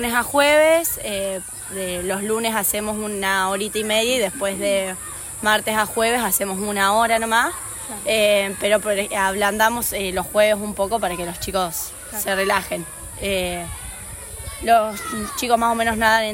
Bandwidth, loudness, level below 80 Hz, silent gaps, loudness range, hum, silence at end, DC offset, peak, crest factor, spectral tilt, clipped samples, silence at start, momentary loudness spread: 16.5 kHz; -20 LUFS; -44 dBFS; none; 4 LU; none; 0 s; under 0.1%; -4 dBFS; 18 dB; -2.5 dB/octave; under 0.1%; 0 s; 11 LU